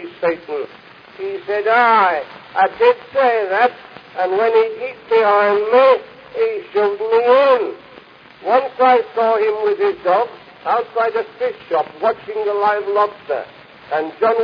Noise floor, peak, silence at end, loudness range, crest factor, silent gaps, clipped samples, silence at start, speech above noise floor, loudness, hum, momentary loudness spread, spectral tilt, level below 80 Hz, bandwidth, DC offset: -42 dBFS; 0 dBFS; 0 s; 4 LU; 16 dB; none; under 0.1%; 0 s; 26 dB; -17 LUFS; none; 14 LU; -5.5 dB/octave; -64 dBFS; 5.2 kHz; under 0.1%